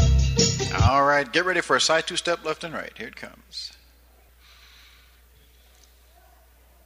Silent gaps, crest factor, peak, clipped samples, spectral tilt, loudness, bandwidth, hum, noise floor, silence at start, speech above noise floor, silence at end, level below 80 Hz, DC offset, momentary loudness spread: none; 20 dB; -4 dBFS; under 0.1%; -4 dB/octave; -22 LUFS; 15.5 kHz; none; -55 dBFS; 0 s; 31 dB; 3.15 s; -32 dBFS; under 0.1%; 18 LU